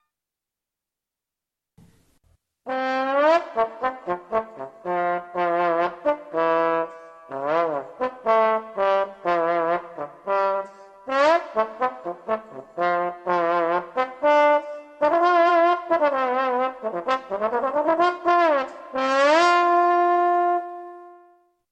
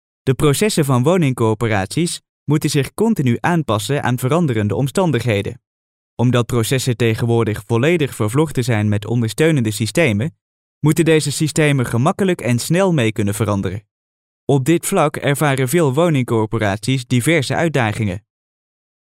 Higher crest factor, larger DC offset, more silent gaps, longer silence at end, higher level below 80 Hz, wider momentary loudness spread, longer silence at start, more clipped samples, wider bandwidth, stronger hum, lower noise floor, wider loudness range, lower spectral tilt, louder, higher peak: about the same, 18 dB vs 14 dB; neither; second, none vs 2.29-2.46 s, 5.67-6.17 s, 10.41-10.81 s, 13.91-14.47 s; second, 0.6 s vs 0.95 s; second, -68 dBFS vs -46 dBFS; first, 12 LU vs 5 LU; first, 2.65 s vs 0.25 s; neither; second, 8.8 kHz vs 16 kHz; neither; about the same, -87 dBFS vs under -90 dBFS; first, 5 LU vs 2 LU; about the same, -4.5 dB/octave vs -5.5 dB/octave; second, -22 LUFS vs -17 LUFS; second, -6 dBFS vs -2 dBFS